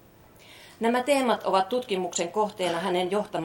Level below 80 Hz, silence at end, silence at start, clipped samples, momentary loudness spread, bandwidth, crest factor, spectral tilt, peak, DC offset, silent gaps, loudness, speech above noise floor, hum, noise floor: -68 dBFS; 0 s; 0.5 s; under 0.1%; 5 LU; 17 kHz; 18 dB; -4 dB/octave; -8 dBFS; under 0.1%; none; -26 LUFS; 27 dB; none; -53 dBFS